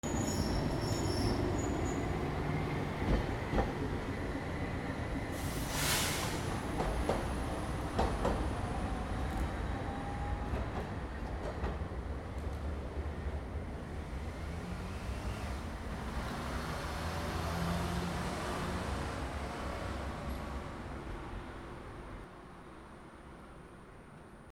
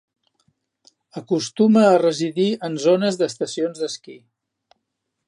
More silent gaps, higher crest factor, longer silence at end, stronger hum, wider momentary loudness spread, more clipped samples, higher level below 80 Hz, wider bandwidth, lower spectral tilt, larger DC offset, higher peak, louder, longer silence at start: neither; about the same, 20 dB vs 18 dB; second, 0.05 s vs 1.1 s; neither; about the same, 13 LU vs 14 LU; neither; first, -42 dBFS vs -74 dBFS; first, 18.5 kHz vs 11 kHz; about the same, -5 dB/octave vs -5.5 dB/octave; neither; second, -18 dBFS vs -2 dBFS; second, -38 LUFS vs -19 LUFS; second, 0.05 s vs 1.15 s